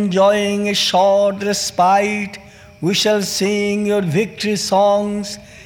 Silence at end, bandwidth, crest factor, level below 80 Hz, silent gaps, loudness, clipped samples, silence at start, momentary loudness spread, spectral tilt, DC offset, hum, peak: 0 s; 18.5 kHz; 12 dB; -54 dBFS; none; -16 LUFS; under 0.1%; 0 s; 10 LU; -4 dB/octave; under 0.1%; none; -4 dBFS